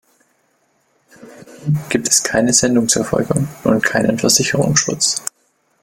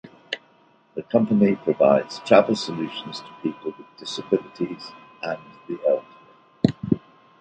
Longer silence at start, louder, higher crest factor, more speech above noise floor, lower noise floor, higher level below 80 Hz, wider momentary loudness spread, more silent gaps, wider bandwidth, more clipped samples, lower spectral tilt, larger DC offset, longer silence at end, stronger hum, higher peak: first, 1.2 s vs 0.05 s; first, -15 LUFS vs -23 LUFS; about the same, 18 dB vs 22 dB; first, 46 dB vs 35 dB; first, -62 dBFS vs -58 dBFS; first, -48 dBFS vs -60 dBFS; second, 8 LU vs 17 LU; neither; first, 17 kHz vs 9 kHz; neither; second, -3.5 dB/octave vs -6.5 dB/octave; neither; first, 0.6 s vs 0.45 s; neither; about the same, 0 dBFS vs -2 dBFS